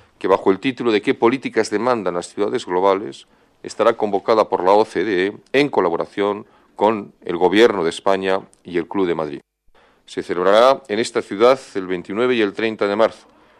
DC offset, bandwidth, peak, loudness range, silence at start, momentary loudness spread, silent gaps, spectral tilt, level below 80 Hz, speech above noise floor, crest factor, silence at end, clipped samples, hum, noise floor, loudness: under 0.1%; 12 kHz; 0 dBFS; 2 LU; 0.2 s; 10 LU; none; -5 dB/octave; -62 dBFS; 36 dB; 18 dB; 0.45 s; under 0.1%; none; -54 dBFS; -18 LUFS